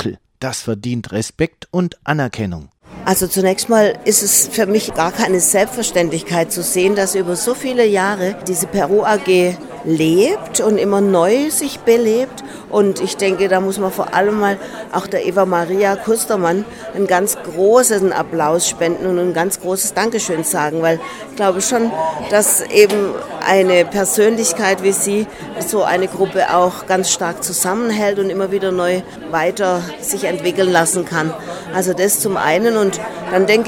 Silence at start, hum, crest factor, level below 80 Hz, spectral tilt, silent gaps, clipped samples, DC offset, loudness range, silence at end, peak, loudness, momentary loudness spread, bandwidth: 0 s; none; 16 dB; -50 dBFS; -3.5 dB/octave; none; under 0.1%; under 0.1%; 3 LU; 0 s; 0 dBFS; -16 LUFS; 9 LU; 18.5 kHz